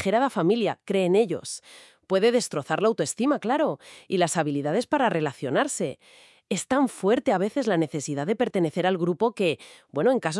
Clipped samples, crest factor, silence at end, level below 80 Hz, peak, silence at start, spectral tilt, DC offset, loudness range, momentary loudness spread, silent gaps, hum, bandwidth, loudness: under 0.1%; 16 dB; 0 s; -72 dBFS; -8 dBFS; 0 s; -5 dB/octave; under 0.1%; 1 LU; 8 LU; none; none; 12 kHz; -25 LUFS